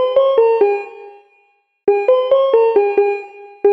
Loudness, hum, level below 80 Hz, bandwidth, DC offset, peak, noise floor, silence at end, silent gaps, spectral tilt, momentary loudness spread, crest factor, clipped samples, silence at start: -15 LUFS; none; -66 dBFS; 5.4 kHz; under 0.1%; -2 dBFS; -58 dBFS; 0 s; none; -5.5 dB/octave; 11 LU; 14 dB; under 0.1%; 0 s